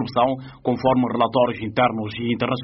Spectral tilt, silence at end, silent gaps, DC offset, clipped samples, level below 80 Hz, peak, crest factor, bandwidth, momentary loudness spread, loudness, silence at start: -5 dB/octave; 0 s; none; under 0.1%; under 0.1%; -54 dBFS; -4 dBFS; 16 dB; 5.8 kHz; 6 LU; -21 LUFS; 0 s